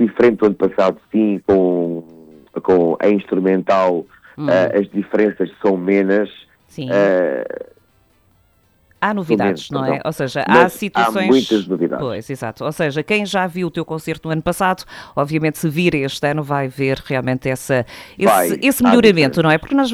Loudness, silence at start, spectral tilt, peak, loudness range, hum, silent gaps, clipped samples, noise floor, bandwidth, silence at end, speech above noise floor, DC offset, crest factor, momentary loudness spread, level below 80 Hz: -17 LUFS; 0 s; -6 dB/octave; 0 dBFS; 4 LU; none; none; under 0.1%; -57 dBFS; 19.5 kHz; 0 s; 40 dB; under 0.1%; 16 dB; 11 LU; -50 dBFS